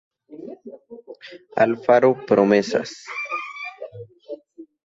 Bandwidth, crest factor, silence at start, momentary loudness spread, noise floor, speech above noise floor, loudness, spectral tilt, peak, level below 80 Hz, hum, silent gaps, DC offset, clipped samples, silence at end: 7.8 kHz; 20 dB; 0.3 s; 24 LU; -44 dBFS; 26 dB; -20 LUFS; -6 dB/octave; -4 dBFS; -66 dBFS; none; none; under 0.1%; under 0.1%; 0.2 s